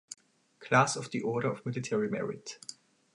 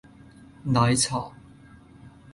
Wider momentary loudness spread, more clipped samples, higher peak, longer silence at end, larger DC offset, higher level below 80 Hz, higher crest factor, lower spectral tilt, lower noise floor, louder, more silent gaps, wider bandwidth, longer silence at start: first, 21 LU vs 17 LU; neither; about the same, -10 dBFS vs -8 dBFS; first, 0.45 s vs 0.25 s; neither; second, -74 dBFS vs -52 dBFS; about the same, 22 dB vs 20 dB; about the same, -4.5 dB/octave vs -4.5 dB/octave; first, -56 dBFS vs -50 dBFS; second, -31 LUFS vs -23 LUFS; neither; about the same, 11.5 kHz vs 11.5 kHz; second, 0.1 s vs 0.65 s